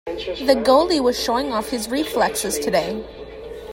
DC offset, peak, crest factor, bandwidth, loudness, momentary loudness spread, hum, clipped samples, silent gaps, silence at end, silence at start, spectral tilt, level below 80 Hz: under 0.1%; -2 dBFS; 18 dB; 16.5 kHz; -20 LUFS; 18 LU; none; under 0.1%; none; 0 s; 0.05 s; -3 dB/octave; -44 dBFS